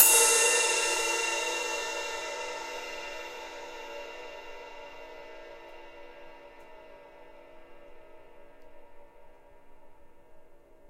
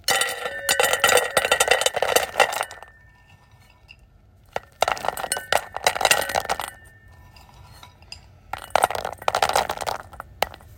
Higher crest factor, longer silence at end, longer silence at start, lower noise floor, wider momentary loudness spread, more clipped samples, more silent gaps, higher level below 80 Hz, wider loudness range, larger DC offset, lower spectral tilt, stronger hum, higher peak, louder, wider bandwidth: first, 30 dB vs 24 dB; about the same, 0 s vs 0.05 s; about the same, 0 s vs 0.1 s; about the same, -52 dBFS vs -53 dBFS; first, 27 LU vs 18 LU; neither; neither; second, -60 dBFS vs -52 dBFS; first, 26 LU vs 7 LU; neither; second, 2 dB/octave vs -0.5 dB/octave; neither; second, -4 dBFS vs 0 dBFS; second, -26 LUFS vs -22 LUFS; about the same, 16 kHz vs 17 kHz